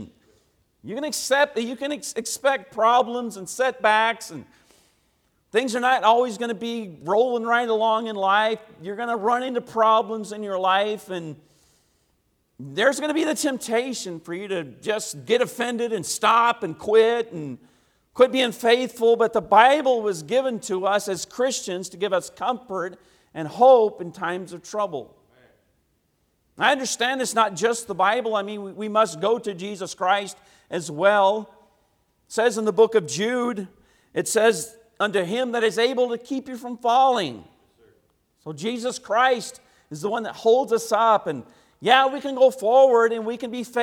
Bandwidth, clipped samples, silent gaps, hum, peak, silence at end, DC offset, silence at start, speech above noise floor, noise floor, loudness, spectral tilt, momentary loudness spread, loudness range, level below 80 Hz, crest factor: 17 kHz; under 0.1%; none; none; 0 dBFS; 0 s; under 0.1%; 0 s; 47 dB; -69 dBFS; -22 LUFS; -3 dB/octave; 14 LU; 6 LU; -68 dBFS; 22 dB